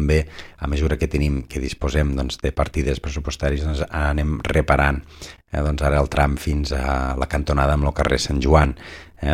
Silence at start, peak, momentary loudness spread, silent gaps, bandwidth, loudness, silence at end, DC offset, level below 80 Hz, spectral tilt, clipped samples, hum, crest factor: 0 s; 0 dBFS; 11 LU; none; 13.5 kHz; -21 LUFS; 0 s; under 0.1%; -26 dBFS; -6 dB/octave; under 0.1%; none; 20 dB